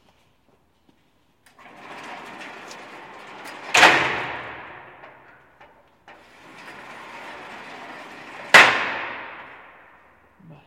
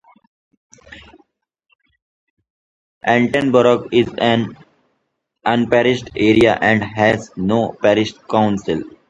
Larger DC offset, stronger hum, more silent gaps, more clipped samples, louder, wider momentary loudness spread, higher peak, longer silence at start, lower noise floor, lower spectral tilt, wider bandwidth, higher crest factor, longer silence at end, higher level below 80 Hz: neither; neither; second, none vs 1.75-1.79 s, 2.02-2.37 s, 2.50-3.01 s; neither; about the same, -16 LUFS vs -16 LUFS; first, 27 LU vs 8 LU; about the same, 0 dBFS vs 0 dBFS; first, 1.9 s vs 0.9 s; second, -64 dBFS vs -72 dBFS; second, -1.5 dB/octave vs -6 dB/octave; first, 16.5 kHz vs 10.5 kHz; first, 26 dB vs 18 dB; first, 1.25 s vs 0.2 s; second, -64 dBFS vs -48 dBFS